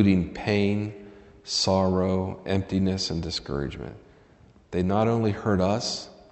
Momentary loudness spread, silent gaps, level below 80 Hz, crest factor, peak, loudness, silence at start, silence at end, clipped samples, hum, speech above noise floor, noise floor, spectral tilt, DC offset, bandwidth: 12 LU; none; -50 dBFS; 20 dB; -6 dBFS; -26 LUFS; 0 s; 0.2 s; under 0.1%; none; 30 dB; -55 dBFS; -5.5 dB/octave; under 0.1%; 8.4 kHz